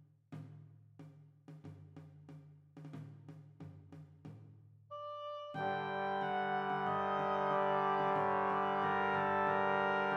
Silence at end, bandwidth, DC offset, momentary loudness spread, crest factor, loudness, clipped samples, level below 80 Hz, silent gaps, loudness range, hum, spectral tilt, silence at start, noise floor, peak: 0 s; 8.8 kHz; under 0.1%; 23 LU; 18 dB; -35 LUFS; under 0.1%; -86 dBFS; none; 21 LU; none; -7 dB/octave; 0.3 s; -60 dBFS; -20 dBFS